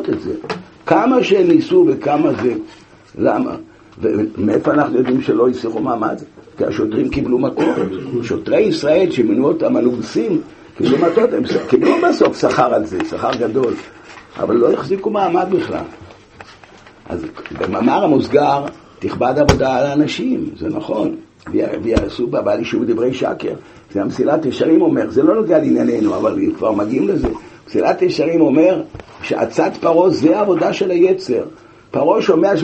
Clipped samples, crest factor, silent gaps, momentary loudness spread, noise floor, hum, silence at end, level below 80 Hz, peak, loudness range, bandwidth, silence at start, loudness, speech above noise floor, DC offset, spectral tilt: under 0.1%; 16 dB; none; 11 LU; -42 dBFS; none; 0 s; -42 dBFS; 0 dBFS; 4 LU; 8.4 kHz; 0 s; -16 LUFS; 27 dB; under 0.1%; -6.5 dB/octave